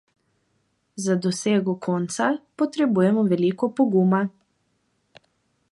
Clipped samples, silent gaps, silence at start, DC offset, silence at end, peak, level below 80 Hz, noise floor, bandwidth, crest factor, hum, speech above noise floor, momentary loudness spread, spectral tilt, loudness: under 0.1%; none; 0.95 s; under 0.1%; 1.4 s; -6 dBFS; -70 dBFS; -70 dBFS; 11.5 kHz; 18 dB; none; 49 dB; 7 LU; -6 dB/octave; -22 LUFS